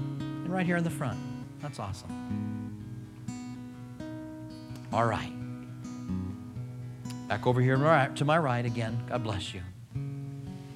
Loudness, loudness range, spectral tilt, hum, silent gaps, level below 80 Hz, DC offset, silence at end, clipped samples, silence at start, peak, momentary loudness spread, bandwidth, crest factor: -32 LUFS; 10 LU; -6.5 dB/octave; none; none; -58 dBFS; under 0.1%; 0 s; under 0.1%; 0 s; -10 dBFS; 16 LU; 13.5 kHz; 22 dB